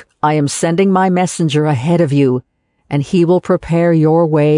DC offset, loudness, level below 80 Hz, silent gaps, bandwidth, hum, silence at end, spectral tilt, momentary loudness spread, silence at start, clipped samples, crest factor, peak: under 0.1%; -14 LUFS; -48 dBFS; none; 11 kHz; none; 0 s; -6.5 dB/octave; 4 LU; 0.25 s; under 0.1%; 10 dB; -2 dBFS